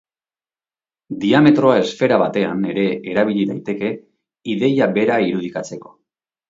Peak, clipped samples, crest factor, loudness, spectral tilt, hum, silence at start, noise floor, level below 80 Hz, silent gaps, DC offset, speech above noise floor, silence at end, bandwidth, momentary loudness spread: 0 dBFS; under 0.1%; 18 dB; -17 LUFS; -6.5 dB/octave; none; 1.1 s; under -90 dBFS; -60 dBFS; none; under 0.1%; over 73 dB; 0.65 s; 7.8 kHz; 16 LU